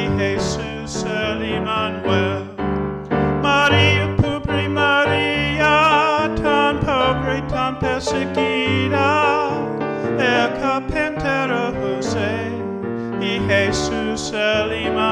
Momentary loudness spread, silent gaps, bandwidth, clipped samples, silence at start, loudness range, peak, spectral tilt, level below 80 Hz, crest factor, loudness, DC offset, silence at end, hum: 9 LU; none; 11 kHz; under 0.1%; 0 s; 5 LU; -2 dBFS; -5 dB/octave; -38 dBFS; 18 dB; -19 LUFS; under 0.1%; 0 s; none